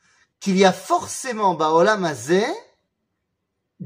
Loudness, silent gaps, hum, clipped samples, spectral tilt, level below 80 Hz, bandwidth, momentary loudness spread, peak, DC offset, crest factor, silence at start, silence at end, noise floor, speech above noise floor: -20 LUFS; none; none; under 0.1%; -4.5 dB/octave; -70 dBFS; 16 kHz; 10 LU; -2 dBFS; under 0.1%; 18 dB; 0.4 s; 0 s; -76 dBFS; 57 dB